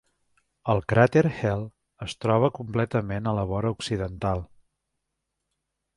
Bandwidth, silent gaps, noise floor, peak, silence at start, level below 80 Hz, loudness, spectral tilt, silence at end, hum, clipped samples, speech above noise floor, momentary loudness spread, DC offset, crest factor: 11.5 kHz; none; -81 dBFS; -4 dBFS; 0.65 s; -48 dBFS; -25 LUFS; -7 dB/octave; 1.5 s; none; under 0.1%; 57 dB; 13 LU; under 0.1%; 22 dB